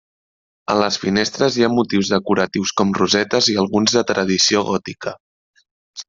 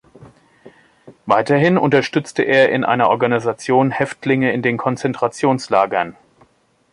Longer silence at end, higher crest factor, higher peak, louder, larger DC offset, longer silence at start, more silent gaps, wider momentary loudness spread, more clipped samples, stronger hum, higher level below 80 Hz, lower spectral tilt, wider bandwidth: second, 0.05 s vs 0.8 s; about the same, 18 dB vs 16 dB; about the same, -2 dBFS vs -2 dBFS; about the same, -17 LUFS vs -17 LUFS; neither; first, 0.7 s vs 0.2 s; first, 5.20-5.54 s, 5.71-5.94 s vs none; about the same, 9 LU vs 7 LU; neither; neither; about the same, -56 dBFS vs -60 dBFS; second, -3.5 dB/octave vs -6 dB/octave; second, 7.6 kHz vs 11.5 kHz